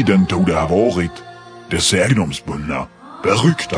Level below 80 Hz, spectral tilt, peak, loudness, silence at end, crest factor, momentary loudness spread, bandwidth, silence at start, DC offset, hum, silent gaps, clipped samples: -40 dBFS; -5 dB/octave; 0 dBFS; -17 LUFS; 0 s; 16 dB; 11 LU; 10.5 kHz; 0 s; under 0.1%; none; none; under 0.1%